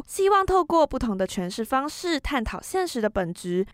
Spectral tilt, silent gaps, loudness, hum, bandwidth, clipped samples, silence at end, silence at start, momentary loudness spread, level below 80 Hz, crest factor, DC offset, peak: -5 dB/octave; none; -25 LUFS; none; 16 kHz; under 0.1%; 0.05 s; 0 s; 8 LU; -42 dBFS; 16 dB; under 0.1%; -10 dBFS